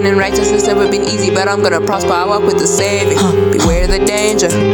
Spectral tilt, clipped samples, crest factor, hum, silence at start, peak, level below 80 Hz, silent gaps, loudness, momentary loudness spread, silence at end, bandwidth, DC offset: -4 dB/octave; under 0.1%; 10 dB; none; 0 s; -2 dBFS; -24 dBFS; none; -12 LUFS; 2 LU; 0 s; 18.5 kHz; under 0.1%